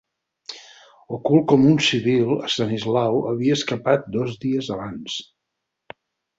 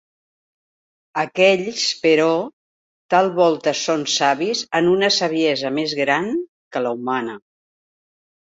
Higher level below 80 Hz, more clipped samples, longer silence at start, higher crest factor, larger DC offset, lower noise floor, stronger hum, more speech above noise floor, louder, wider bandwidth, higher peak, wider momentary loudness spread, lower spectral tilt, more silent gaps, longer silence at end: first, -58 dBFS vs -66 dBFS; neither; second, 0.5 s vs 1.15 s; about the same, 18 dB vs 18 dB; neither; second, -80 dBFS vs under -90 dBFS; neither; second, 60 dB vs over 71 dB; about the same, -21 LUFS vs -19 LUFS; about the same, 8 kHz vs 8 kHz; about the same, -4 dBFS vs -2 dBFS; first, 19 LU vs 9 LU; first, -5.5 dB/octave vs -3.5 dB/octave; second, none vs 2.53-3.09 s, 6.49-6.71 s; about the same, 1.15 s vs 1.05 s